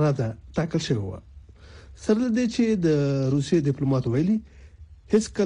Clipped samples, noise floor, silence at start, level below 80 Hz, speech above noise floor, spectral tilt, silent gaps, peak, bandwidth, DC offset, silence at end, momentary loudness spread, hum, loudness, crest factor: under 0.1%; -47 dBFS; 0 s; -48 dBFS; 24 dB; -7 dB/octave; none; -8 dBFS; 10.5 kHz; under 0.1%; 0 s; 7 LU; none; -24 LUFS; 16 dB